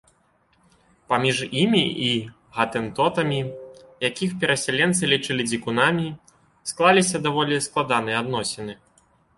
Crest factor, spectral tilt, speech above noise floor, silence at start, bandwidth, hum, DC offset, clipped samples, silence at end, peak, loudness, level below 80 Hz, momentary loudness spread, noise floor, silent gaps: 20 dB; -4 dB/octave; 41 dB; 1.1 s; 11.5 kHz; none; under 0.1%; under 0.1%; 0.65 s; -2 dBFS; -22 LUFS; -60 dBFS; 14 LU; -63 dBFS; none